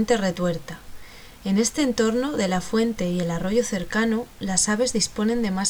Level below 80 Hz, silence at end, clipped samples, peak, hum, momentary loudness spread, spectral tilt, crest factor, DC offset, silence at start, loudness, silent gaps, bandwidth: -46 dBFS; 0 s; under 0.1%; -6 dBFS; none; 6 LU; -4 dB/octave; 16 dB; under 0.1%; 0 s; -23 LUFS; none; over 20 kHz